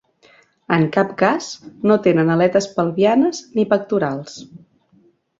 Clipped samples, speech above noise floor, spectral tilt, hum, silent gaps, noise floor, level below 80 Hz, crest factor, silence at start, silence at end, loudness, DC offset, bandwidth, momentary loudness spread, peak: under 0.1%; 39 dB; -6.5 dB/octave; none; none; -56 dBFS; -60 dBFS; 18 dB; 0.7 s; 0.85 s; -18 LUFS; under 0.1%; 8 kHz; 10 LU; -2 dBFS